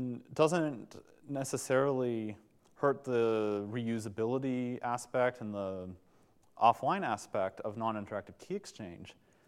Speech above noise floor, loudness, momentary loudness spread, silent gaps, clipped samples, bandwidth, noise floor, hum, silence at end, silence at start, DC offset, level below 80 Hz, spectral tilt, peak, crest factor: 32 dB; -34 LUFS; 17 LU; none; under 0.1%; 15 kHz; -65 dBFS; none; 0.35 s; 0 s; under 0.1%; -78 dBFS; -5.5 dB/octave; -12 dBFS; 22 dB